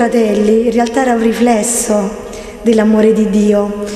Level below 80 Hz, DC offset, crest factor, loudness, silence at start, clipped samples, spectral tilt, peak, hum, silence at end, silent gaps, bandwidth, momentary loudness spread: -40 dBFS; under 0.1%; 12 dB; -12 LUFS; 0 s; under 0.1%; -5 dB/octave; 0 dBFS; none; 0 s; none; 14 kHz; 7 LU